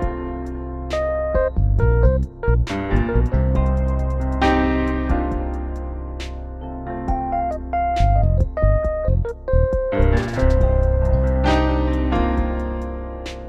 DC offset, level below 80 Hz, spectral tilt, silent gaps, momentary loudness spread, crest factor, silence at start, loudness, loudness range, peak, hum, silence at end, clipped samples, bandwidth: under 0.1%; -22 dBFS; -8 dB/octave; none; 12 LU; 14 dB; 0 s; -21 LUFS; 4 LU; -4 dBFS; none; 0 s; under 0.1%; 7.6 kHz